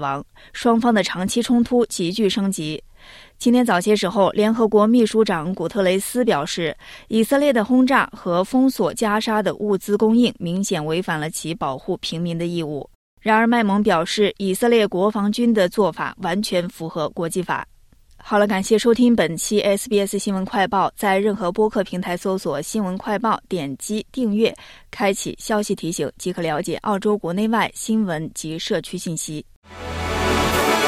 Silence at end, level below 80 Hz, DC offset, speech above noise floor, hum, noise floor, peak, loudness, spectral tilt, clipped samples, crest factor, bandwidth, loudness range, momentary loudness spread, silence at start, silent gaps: 0 s; -48 dBFS; under 0.1%; 29 dB; none; -49 dBFS; -4 dBFS; -20 LUFS; -5 dB/octave; under 0.1%; 16 dB; 15.5 kHz; 5 LU; 10 LU; 0 s; 12.95-13.17 s, 29.56-29.62 s